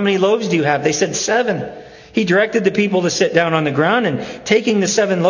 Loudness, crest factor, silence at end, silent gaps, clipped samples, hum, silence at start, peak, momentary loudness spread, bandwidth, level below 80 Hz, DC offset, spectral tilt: -16 LUFS; 16 dB; 0 s; none; under 0.1%; none; 0 s; 0 dBFS; 6 LU; 7.4 kHz; -56 dBFS; under 0.1%; -4.5 dB/octave